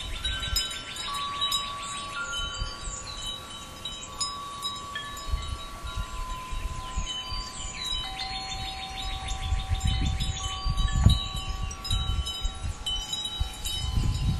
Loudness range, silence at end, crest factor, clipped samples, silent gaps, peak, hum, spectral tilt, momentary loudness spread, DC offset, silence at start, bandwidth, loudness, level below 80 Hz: 6 LU; 0 s; 24 dB; under 0.1%; none; -6 dBFS; none; -3 dB/octave; 9 LU; under 0.1%; 0 s; 14.5 kHz; -31 LUFS; -34 dBFS